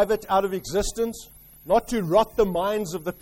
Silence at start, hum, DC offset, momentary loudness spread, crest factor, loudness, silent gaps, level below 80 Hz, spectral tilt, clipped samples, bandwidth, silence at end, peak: 0 s; none; under 0.1%; 8 LU; 18 dB; -24 LUFS; none; -42 dBFS; -5 dB/octave; under 0.1%; 16.5 kHz; 0.1 s; -6 dBFS